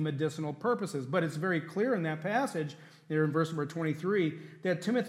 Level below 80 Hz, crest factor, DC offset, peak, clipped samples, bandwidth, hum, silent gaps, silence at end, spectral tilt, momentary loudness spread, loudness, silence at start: -82 dBFS; 16 dB; under 0.1%; -14 dBFS; under 0.1%; 13.5 kHz; none; none; 0 s; -6.5 dB/octave; 5 LU; -32 LUFS; 0 s